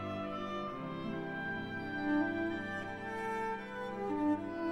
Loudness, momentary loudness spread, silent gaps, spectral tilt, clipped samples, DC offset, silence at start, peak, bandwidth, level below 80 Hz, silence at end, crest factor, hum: -38 LUFS; 7 LU; none; -6.5 dB/octave; under 0.1%; under 0.1%; 0 s; -22 dBFS; 10.5 kHz; -62 dBFS; 0 s; 16 dB; none